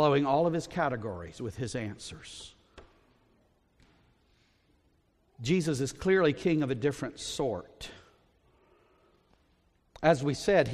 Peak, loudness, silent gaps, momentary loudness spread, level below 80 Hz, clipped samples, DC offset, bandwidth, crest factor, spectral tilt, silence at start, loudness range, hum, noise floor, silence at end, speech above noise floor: -10 dBFS; -30 LUFS; none; 19 LU; -58 dBFS; under 0.1%; under 0.1%; 14 kHz; 22 dB; -5.5 dB/octave; 0 s; 13 LU; none; -69 dBFS; 0 s; 40 dB